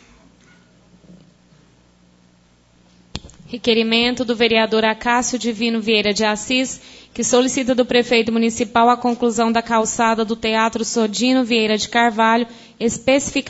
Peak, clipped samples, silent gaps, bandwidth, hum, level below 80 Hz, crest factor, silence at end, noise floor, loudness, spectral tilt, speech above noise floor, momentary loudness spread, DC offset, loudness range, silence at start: -2 dBFS; under 0.1%; none; 8 kHz; none; -50 dBFS; 18 dB; 0 s; -54 dBFS; -17 LUFS; -3 dB/octave; 37 dB; 8 LU; under 0.1%; 3 LU; 3.15 s